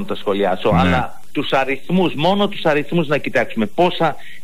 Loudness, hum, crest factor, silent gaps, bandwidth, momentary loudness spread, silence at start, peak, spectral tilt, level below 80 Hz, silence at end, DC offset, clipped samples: -18 LUFS; none; 12 dB; none; 15.5 kHz; 5 LU; 0 s; -6 dBFS; -6.5 dB/octave; -42 dBFS; 0.05 s; 5%; under 0.1%